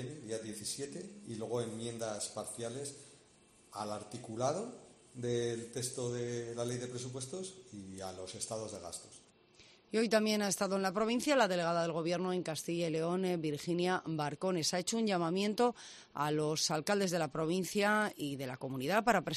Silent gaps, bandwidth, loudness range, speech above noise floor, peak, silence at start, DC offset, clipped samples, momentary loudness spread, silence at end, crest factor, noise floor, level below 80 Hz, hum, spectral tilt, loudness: none; 13 kHz; 9 LU; 29 dB; -14 dBFS; 0 s; under 0.1%; under 0.1%; 14 LU; 0 s; 22 dB; -65 dBFS; -72 dBFS; none; -4 dB/octave; -36 LUFS